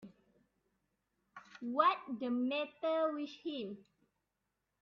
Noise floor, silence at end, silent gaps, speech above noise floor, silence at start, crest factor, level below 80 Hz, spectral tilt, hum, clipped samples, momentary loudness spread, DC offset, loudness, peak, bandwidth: -86 dBFS; 1 s; none; 50 dB; 0 s; 24 dB; -86 dBFS; -6 dB/octave; none; under 0.1%; 16 LU; under 0.1%; -36 LUFS; -16 dBFS; 6.6 kHz